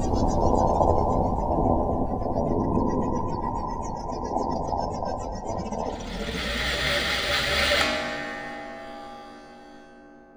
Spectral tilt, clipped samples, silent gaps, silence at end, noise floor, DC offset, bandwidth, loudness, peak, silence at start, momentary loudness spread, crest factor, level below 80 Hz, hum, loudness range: -5 dB/octave; under 0.1%; none; 0.1 s; -49 dBFS; under 0.1%; over 20 kHz; -26 LUFS; -6 dBFS; 0 s; 15 LU; 20 dB; -36 dBFS; none; 5 LU